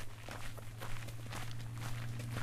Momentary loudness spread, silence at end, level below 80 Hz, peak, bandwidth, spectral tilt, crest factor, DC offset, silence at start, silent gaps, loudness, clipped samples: 5 LU; 0 s; -50 dBFS; -26 dBFS; 15.5 kHz; -4.5 dB/octave; 14 dB; under 0.1%; 0 s; none; -45 LUFS; under 0.1%